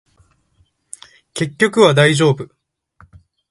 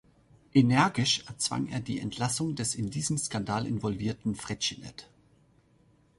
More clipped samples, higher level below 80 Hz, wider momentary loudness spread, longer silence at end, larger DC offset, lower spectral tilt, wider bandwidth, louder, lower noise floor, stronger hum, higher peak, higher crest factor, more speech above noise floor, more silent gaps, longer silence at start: neither; about the same, -56 dBFS vs -58 dBFS; first, 26 LU vs 10 LU; about the same, 1.05 s vs 1.15 s; neither; about the same, -5 dB/octave vs -4 dB/octave; about the same, 11.5 kHz vs 11.5 kHz; first, -14 LUFS vs -29 LUFS; second, -60 dBFS vs -64 dBFS; neither; first, 0 dBFS vs -10 dBFS; about the same, 18 dB vs 22 dB; first, 47 dB vs 35 dB; neither; first, 1.35 s vs 0.55 s